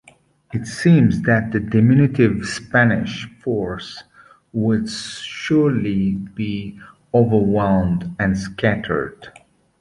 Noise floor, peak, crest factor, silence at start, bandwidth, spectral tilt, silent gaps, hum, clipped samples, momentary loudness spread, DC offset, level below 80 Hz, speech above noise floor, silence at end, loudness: -51 dBFS; -2 dBFS; 16 dB; 0.5 s; 11.5 kHz; -7 dB/octave; none; none; under 0.1%; 14 LU; under 0.1%; -44 dBFS; 33 dB; 0.5 s; -19 LUFS